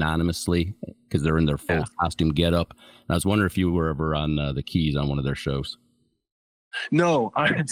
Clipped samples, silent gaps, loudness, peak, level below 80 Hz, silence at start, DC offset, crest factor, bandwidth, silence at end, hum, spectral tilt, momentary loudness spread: under 0.1%; 6.32-6.71 s; -24 LUFS; -6 dBFS; -42 dBFS; 0 s; under 0.1%; 18 dB; 16 kHz; 0 s; none; -6 dB/octave; 9 LU